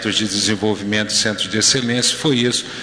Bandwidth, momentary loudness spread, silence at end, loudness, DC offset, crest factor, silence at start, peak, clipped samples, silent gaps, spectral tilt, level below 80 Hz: 11 kHz; 5 LU; 0 s; -16 LUFS; 0.1%; 12 dB; 0 s; -6 dBFS; under 0.1%; none; -2.5 dB/octave; -54 dBFS